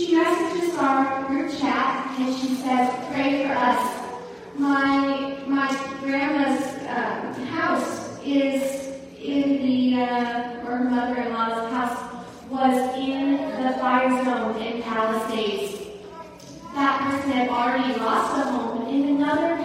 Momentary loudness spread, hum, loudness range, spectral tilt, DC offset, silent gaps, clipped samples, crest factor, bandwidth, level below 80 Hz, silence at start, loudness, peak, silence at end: 11 LU; none; 2 LU; -4.5 dB/octave; under 0.1%; none; under 0.1%; 16 dB; 15.5 kHz; -60 dBFS; 0 s; -23 LUFS; -6 dBFS; 0 s